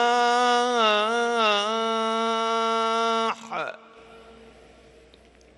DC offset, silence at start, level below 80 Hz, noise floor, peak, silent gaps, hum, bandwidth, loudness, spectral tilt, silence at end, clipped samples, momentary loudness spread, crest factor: under 0.1%; 0 s; -66 dBFS; -53 dBFS; -10 dBFS; none; none; 11.5 kHz; -23 LUFS; -2 dB/octave; 1.15 s; under 0.1%; 8 LU; 16 dB